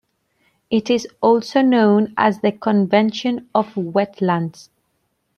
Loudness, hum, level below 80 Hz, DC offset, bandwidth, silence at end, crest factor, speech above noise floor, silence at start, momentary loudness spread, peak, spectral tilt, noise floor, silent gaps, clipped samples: -18 LUFS; none; -64 dBFS; under 0.1%; 7 kHz; 0.75 s; 16 dB; 52 dB; 0.7 s; 7 LU; -2 dBFS; -6.5 dB/octave; -69 dBFS; none; under 0.1%